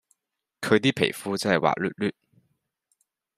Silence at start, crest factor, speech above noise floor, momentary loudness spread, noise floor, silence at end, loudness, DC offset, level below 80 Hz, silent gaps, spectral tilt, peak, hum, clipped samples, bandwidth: 0.6 s; 22 dB; 57 dB; 9 LU; -81 dBFS; 1.25 s; -25 LUFS; under 0.1%; -68 dBFS; none; -5 dB/octave; -4 dBFS; none; under 0.1%; 15.5 kHz